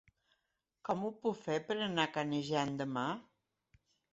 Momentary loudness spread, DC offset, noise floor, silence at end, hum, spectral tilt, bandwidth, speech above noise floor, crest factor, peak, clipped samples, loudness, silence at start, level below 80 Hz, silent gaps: 6 LU; under 0.1%; -85 dBFS; 0.9 s; none; -3.5 dB/octave; 8 kHz; 49 dB; 22 dB; -16 dBFS; under 0.1%; -37 LUFS; 0.85 s; -76 dBFS; none